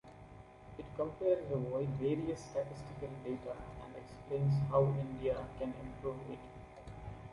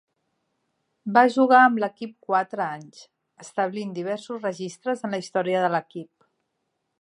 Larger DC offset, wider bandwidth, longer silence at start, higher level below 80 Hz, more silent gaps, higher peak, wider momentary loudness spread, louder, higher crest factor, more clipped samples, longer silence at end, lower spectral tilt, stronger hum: neither; about the same, 11 kHz vs 11 kHz; second, 0.05 s vs 1.05 s; first, -58 dBFS vs -80 dBFS; neither; second, -18 dBFS vs -2 dBFS; about the same, 19 LU vs 18 LU; second, -38 LUFS vs -23 LUFS; about the same, 20 dB vs 22 dB; neither; second, 0 s vs 0.95 s; first, -8.5 dB/octave vs -5.5 dB/octave; neither